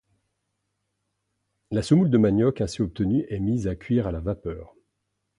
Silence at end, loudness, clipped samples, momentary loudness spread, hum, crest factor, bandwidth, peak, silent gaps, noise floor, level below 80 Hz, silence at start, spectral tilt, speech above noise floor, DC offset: 0.75 s; -24 LUFS; under 0.1%; 11 LU; none; 18 dB; 11.5 kHz; -8 dBFS; none; -78 dBFS; -44 dBFS; 1.7 s; -8 dB/octave; 55 dB; under 0.1%